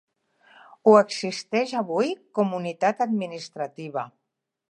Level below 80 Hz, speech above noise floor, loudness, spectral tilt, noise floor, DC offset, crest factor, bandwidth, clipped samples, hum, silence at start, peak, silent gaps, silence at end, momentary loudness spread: -80 dBFS; 35 dB; -24 LUFS; -5.5 dB/octave; -59 dBFS; under 0.1%; 22 dB; 10.5 kHz; under 0.1%; none; 0.85 s; -2 dBFS; none; 0.6 s; 16 LU